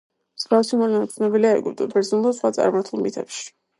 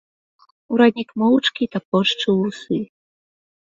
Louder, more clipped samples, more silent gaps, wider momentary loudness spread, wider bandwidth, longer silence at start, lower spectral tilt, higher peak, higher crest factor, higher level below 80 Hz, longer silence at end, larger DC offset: about the same, -21 LUFS vs -19 LUFS; neither; second, none vs 1.85-1.92 s; about the same, 11 LU vs 9 LU; first, 11.5 kHz vs 7.6 kHz; second, 0.4 s vs 0.7 s; about the same, -5 dB/octave vs -5.5 dB/octave; second, -6 dBFS vs -2 dBFS; about the same, 16 dB vs 18 dB; second, -72 dBFS vs -64 dBFS; second, 0.3 s vs 0.9 s; neither